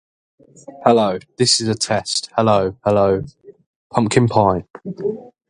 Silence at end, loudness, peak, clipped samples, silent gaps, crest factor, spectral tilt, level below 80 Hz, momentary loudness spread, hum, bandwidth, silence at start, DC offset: 0.2 s; -17 LUFS; 0 dBFS; under 0.1%; 3.66-3.90 s; 18 dB; -4.5 dB/octave; -48 dBFS; 10 LU; none; 11.5 kHz; 0.7 s; under 0.1%